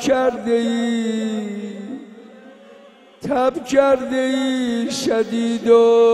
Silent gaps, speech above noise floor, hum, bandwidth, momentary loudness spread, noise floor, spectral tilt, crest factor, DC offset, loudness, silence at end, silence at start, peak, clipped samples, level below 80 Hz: none; 29 dB; none; 13 kHz; 16 LU; -46 dBFS; -4.5 dB/octave; 16 dB; under 0.1%; -18 LUFS; 0 s; 0 s; -2 dBFS; under 0.1%; -58 dBFS